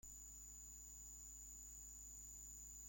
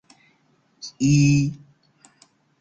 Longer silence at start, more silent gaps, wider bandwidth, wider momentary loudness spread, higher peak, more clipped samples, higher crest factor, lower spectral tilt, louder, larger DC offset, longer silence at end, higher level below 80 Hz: second, 0.05 s vs 0.85 s; neither; first, 16.5 kHz vs 8 kHz; second, 1 LU vs 22 LU; second, -46 dBFS vs -8 dBFS; neither; about the same, 12 dB vs 16 dB; second, -2 dB/octave vs -5.5 dB/octave; second, -55 LUFS vs -20 LUFS; neither; second, 0 s vs 1.05 s; second, -64 dBFS vs -52 dBFS